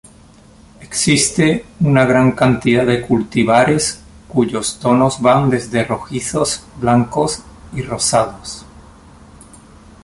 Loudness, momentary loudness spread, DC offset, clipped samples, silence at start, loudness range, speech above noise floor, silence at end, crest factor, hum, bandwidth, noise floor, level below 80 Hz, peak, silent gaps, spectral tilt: -15 LUFS; 11 LU; under 0.1%; under 0.1%; 0.8 s; 5 LU; 29 dB; 1.4 s; 16 dB; none; 11.5 kHz; -44 dBFS; -42 dBFS; -2 dBFS; none; -5 dB/octave